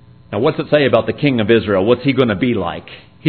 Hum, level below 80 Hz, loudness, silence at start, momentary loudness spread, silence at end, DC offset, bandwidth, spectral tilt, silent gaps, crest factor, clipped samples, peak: none; -48 dBFS; -15 LUFS; 0.3 s; 9 LU; 0 s; 0.3%; 5.4 kHz; -10 dB/octave; none; 16 dB; under 0.1%; 0 dBFS